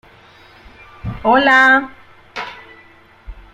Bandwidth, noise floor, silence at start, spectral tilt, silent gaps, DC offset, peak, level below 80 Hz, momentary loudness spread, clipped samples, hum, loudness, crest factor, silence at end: 15 kHz; -46 dBFS; 1.05 s; -5 dB/octave; none; under 0.1%; 0 dBFS; -42 dBFS; 22 LU; under 0.1%; none; -12 LUFS; 18 dB; 0.15 s